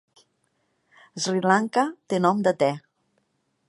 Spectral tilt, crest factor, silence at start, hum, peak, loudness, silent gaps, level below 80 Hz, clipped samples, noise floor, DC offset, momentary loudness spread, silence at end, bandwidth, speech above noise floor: -5 dB/octave; 20 dB; 1.15 s; none; -4 dBFS; -23 LUFS; none; -74 dBFS; under 0.1%; -72 dBFS; under 0.1%; 10 LU; 0.9 s; 11.5 kHz; 49 dB